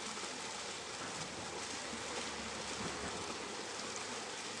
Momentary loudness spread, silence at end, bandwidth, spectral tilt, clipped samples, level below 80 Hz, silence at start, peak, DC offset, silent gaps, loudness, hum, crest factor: 2 LU; 0 s; 11.5 kHz; -1.5 dB/octave; under 0.1%; -68 dBFS; 0 s; -26 dBFS; under 0.1%; none; -42 LUFS; none; 18 dB